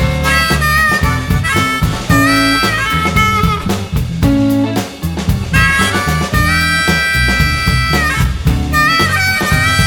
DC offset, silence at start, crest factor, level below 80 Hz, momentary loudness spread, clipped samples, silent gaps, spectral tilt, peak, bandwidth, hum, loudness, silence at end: under 0.1%; 0 s; 12 dB; -22 dBFS; 6 LU; under 0.1%; none; -4.5 dB/octave; 0 dBFS; 18 kHz; none; -12 LUFS; 0 s